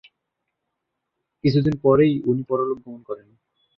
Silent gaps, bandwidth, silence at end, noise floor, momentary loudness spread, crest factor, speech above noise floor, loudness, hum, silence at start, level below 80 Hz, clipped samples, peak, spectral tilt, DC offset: none; 6.4 kHz; 0.6 s; -80 dBFS; 18 LU; 18 dB; 59 dB; -20 LUFS; none; 1.45 s; -54 dBFS; under 0.1%; -4 dBFS; -9.5 dB/octave; under 0.1%